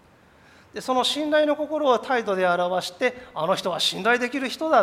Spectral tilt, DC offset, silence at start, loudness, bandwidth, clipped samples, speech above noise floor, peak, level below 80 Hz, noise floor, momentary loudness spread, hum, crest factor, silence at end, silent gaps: -3.5 dB/octave; under 0.1%; 0.75 s; -23 LUFS; 16 kHz; under 0.1%; 31 dB; -6 dBFS; -64 dBFS; -54 dBFS; 6 LU; none; 18 dB; 0 s; none